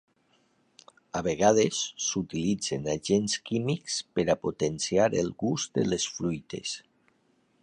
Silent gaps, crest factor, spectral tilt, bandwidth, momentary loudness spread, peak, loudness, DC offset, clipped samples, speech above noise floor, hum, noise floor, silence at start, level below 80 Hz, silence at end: none; 22 dB; -4 dB/octave; 11 kHz; 8 LU; -8 dBFS; -28 LUFS; under 0.1%; under 0.1%; 41 dB; none; -68 dBFS; 1.15 s; -58 dBFS; 0.8 s